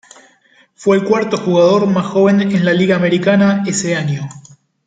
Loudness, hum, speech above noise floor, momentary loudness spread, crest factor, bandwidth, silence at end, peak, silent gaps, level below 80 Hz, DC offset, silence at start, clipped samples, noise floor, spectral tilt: -14 LUFS; none; 39 dB; 7 LU; 12 dB; 9.4 kHz; 0.45 s; -2 dBFS; none; -56 dBFS; under 0.1%; 0.8 s; under 0.1%; -52 dBFS; -6 dB/octave